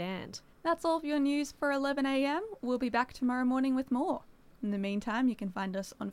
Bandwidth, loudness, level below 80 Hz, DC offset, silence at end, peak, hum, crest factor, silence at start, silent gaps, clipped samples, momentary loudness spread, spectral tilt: 15 kHz; -32 LUFS; -64 dBFS; under 0.1%; 0 s; -16 dBFS; none; 16 dB; 0 s; none; under 0.1%; 8 LU; -5.5 dB/octave